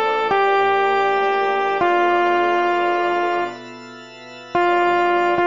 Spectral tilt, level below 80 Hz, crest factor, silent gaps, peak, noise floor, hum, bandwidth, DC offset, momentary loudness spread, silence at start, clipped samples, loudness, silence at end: -5 dB/octave; -62 dBFS; 14 dB; none; -6 dBFS; -38 dBFS; none; 7.4 kHz; 0.3%; 19 LU; 0 s; under 0.1%; -18 LUFS; 0 s